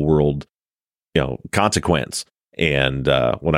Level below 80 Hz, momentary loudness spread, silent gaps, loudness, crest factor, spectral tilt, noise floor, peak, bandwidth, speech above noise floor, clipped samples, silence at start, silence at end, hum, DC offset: -38 dBFS; 10 LU; 2.43-2.48 s; -20 LUFS; 18 dB; -5 dB/octave; under -90 dBFS; -2 dBFS; 16 kHz; over 71 dB; under 0.1%; 0 s; 0 s; none; under 0.1%